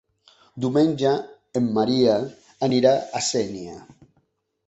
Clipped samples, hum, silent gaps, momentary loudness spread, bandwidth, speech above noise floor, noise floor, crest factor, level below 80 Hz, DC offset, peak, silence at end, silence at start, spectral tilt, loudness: under 0.1%; none; none; 11 LU; 8.2 kHz; 47 dB; -68 dBFS; 20 dB; -60 dBFS; under 0.1%; -4 dBFS; 0.85 s; 0.55 s; -5 dB/octave; -22 LUFS